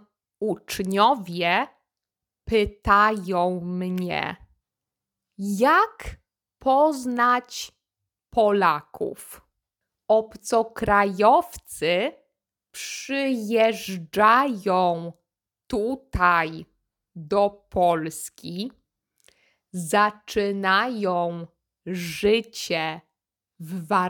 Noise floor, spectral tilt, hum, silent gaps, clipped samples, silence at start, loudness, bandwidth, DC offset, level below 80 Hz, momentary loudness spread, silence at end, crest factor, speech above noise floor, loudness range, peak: -88 dBFS; -4.5 dB/octave; none; none; under 0.1%; 0.4 s; -23 LUFS; 19.5 kHz; under 0.1%; -48 dBFS; 17 LU; 0 s; 20 dB; 65 dB; 3 LU; -4 dBFS